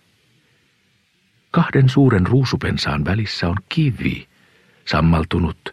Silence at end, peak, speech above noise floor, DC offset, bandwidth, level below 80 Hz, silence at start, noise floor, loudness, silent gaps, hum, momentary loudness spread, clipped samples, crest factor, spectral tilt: 0 s; -2 dBFS; 44 dB; under 0.1%; 10.5 kHz; -36 dBFS; 1.55 s; -61 dBFS; -18 LUFS; none; none; 8 LU; under 0.1%; 16 dB; -7 dB/octave